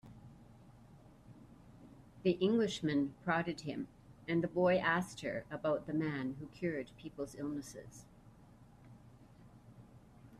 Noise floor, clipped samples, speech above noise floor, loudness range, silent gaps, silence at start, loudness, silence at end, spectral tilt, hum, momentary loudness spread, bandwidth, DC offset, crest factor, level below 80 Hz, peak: -60 dBFS; under 0.1%; 24 dB; 11 LU; none; 0.05 s; -37 LUFS; 0.05 s; -6 dB/octave; none; 26 LU; 13.5 kHz; under 0.1%; 20 dB; -68 dBFS; -18 dBFS